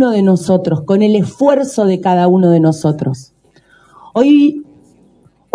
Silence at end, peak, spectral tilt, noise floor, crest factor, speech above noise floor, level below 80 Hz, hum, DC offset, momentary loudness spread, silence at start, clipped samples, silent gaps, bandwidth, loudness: 0.9 s; 0 dBFS; -7.5 dB/octave; -50 dBFS; 12 dB; 39 dB; -56 dBFS; none; under 0.1%; 10 LU; 0 s; under 0.1%; none; 11 kHz; -12 LUFS